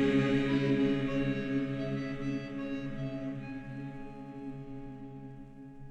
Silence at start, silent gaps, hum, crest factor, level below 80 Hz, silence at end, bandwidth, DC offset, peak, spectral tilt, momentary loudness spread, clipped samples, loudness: 0 s; none; none; 16 dB; -52 dBFS; 0 s; 8.2 kHz; under 0.1%; -16 dBFS; -7.5 dB/octave; 18 LU; under 0.1%; -34 LUFS